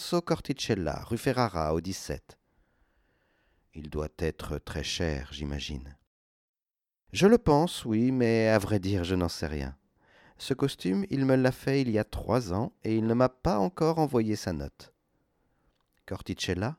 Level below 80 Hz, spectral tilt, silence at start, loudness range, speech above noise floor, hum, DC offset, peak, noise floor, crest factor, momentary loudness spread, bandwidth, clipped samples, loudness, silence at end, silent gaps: -46 dBFS; -6 dB/octave; 0 s; 9 LU; over 62 dB; none; under 0.1%; -8 dBFS; under -90 dBFS; 22 dB; 13 LU; 16 kHz; under 0.1%; -29 LUFS; 0.05 s; 6.07-6.54 s